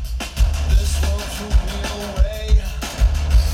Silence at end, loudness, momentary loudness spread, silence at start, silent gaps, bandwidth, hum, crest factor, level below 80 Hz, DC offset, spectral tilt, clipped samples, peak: 0 s; -21 LUFS; 7 LU; 0 s; none; 15.5 kHz; none; 14 dB; -18 dBFS; under 0.1%; -5 dB/octave; under 0.1%; -4 dBFS